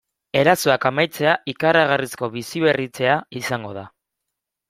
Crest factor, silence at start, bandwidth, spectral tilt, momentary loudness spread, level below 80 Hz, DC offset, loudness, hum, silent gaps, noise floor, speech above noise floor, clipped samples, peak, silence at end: 20 dB; 0.35 s; 16 kHz; -4.5 dB/octave; 11 LU; -60 dBFS; under 0.1%; -20 LUFS; none; none; -82 dBFS; 62 dB; under 0.1%; -2 dBFS; 0.8 s